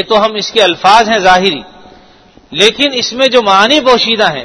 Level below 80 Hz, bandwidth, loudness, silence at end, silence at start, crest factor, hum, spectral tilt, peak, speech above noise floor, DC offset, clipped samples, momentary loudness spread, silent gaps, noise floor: -44 dBFS; 11 kHz; -8 LUFS; 0 s; 0 s; 10 dB; none; -2.5 dB/octave; 0 dBFS; 33 dB; under 0.1%; 1%; 5 LU; none; -42 dBFS